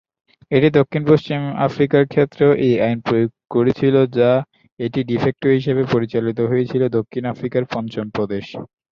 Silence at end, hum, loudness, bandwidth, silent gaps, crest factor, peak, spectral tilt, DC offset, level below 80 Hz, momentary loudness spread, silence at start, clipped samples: 0.25 s; none; -18 LUFS; 6.8 kHz; 4.72-4.77 s; 16 dB; -2 dBFS; -9 dB/octave; under 0.1%; -54 dBFS; 9 LU; 0.5 s; under 0.1%